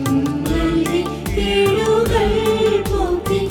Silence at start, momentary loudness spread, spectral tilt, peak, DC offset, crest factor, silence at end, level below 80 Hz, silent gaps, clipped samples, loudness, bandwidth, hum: 0 s; 4 LU; -5.5 dB/octave; -4 dBFS; under 0.1%; 12 dB; 0 s; -28 dBFS; none; under 0.1%; -18 LUFS; 18.5 kHz; none